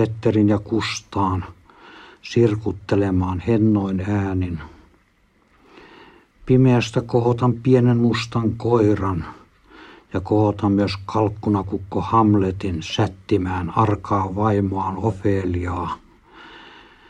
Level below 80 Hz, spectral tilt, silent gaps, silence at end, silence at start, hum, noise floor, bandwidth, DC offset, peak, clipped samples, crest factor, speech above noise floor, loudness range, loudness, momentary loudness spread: -46 dBFS; -7.5 dB/octave; none; 0.4 s; 0 s; none; -60 dBFS; 9.2 kHz; under 0.1%; -4 dBFS; under 0.1%; 18 dB; 40 dB; 4 LU; -20 LUFS; 10 LU